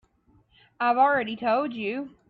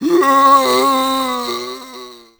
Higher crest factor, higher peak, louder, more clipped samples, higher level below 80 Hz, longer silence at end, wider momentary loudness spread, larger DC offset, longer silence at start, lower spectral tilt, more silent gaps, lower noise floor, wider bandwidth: about the same, 18 dB vs 14 dB; second, -10 dBFS vs 0 dBFS; second, -25 LUFS vs -13 LUFS; neither; second, -68 dBFS vs -56 dBFS; about the same, 0.2 s vs 0.25 s; second, 10 LU vs 21 LU; neither; first, 0.8 s vs 0 s; first, -7.5 dB/octave vs -2.5 dB/octave; neither; first, -63 dBFS vs -36 dBFS; second, 5 kHz vs over 20 kHz